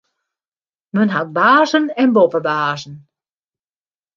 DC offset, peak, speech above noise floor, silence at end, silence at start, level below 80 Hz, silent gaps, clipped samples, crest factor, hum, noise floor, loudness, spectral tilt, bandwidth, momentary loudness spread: under 0.1%; -2 dBFS; over 75 dB; 1.2 s; 0.95 s; -68 dBFS; none; under 0.1%; 16 dB; none; under -90 dBFS; -15 LUFS; -6 dB/octave; 7.2 kHz; 11 LU